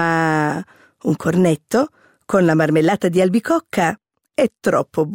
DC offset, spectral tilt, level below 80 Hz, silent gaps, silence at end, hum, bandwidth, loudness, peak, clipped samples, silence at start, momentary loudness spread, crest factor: under 0.1%; -6.5 dB/octave; -58 dBFS; none; 0 s; none; 16.5 kHz; -18 LUFS; -6 dBFS; under 0.1%; 0 s; 9 LU; 12 dB